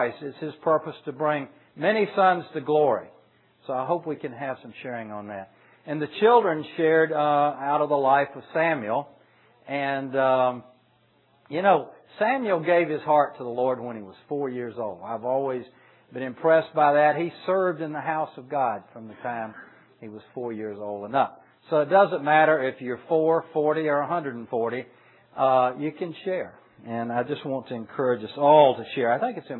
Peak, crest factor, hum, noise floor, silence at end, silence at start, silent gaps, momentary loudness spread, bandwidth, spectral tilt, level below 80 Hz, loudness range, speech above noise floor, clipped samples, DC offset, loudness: -4 dBFS; 20 dB; none; -63 dBFS; 0 s; 0 s; none; 15 LU; 4.2 kHz; -9.5 dB/octave; -80 dBFS; 7 LU; 39 dB; under 0.1%; under 0.1%; -24 LUFS